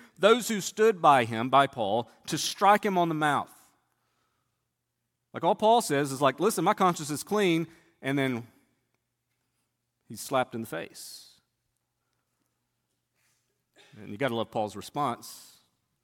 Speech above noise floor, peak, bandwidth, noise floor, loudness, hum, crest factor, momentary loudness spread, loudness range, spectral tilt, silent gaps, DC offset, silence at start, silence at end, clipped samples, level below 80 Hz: 55 dB; -8 dBFS; 17.5 kHz; -82 dBFS; -26 LUFS; none; 22 dB; 18 LU; 13 LU; -4.5 dB/octave; none; under 0.1%; 0.2 s; 0.65 s; under 0.1%; -74 dBFS